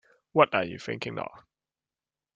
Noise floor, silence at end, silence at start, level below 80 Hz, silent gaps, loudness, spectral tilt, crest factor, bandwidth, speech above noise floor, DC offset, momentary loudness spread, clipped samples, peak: under -90 dBFS; 0.95 s; 0.35 s; -70 dBFS; none; -28 LUFS; -6 dB/octave; 26 dB; 7.8 kHz; over 63 dB; under 0.1%; 14 LU; under 0.1%; -4 dBFS